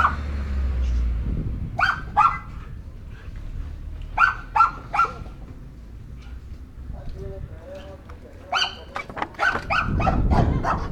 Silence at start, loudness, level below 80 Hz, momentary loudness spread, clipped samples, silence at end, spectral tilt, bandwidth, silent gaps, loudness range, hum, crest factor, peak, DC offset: 0 s; -23 LUFS; -30 dBFS; 21 LU; under 0.1%; 0 s; -5.5 dB/octave; 9.2 kHz; none; 8 LU; none; 22 dB; -4 dBFS; under 0.1%